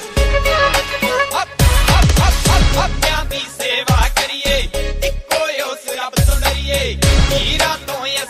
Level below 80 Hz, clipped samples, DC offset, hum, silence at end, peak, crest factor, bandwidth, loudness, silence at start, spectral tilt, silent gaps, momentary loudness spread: -18 dBFS; under 0.1%; under 0.1%; none; 0 s; 0 dBFS; 14 dB; 16 kHz; -16 LUFS; 0 s; -3.5 dB/octave; none; 7 LU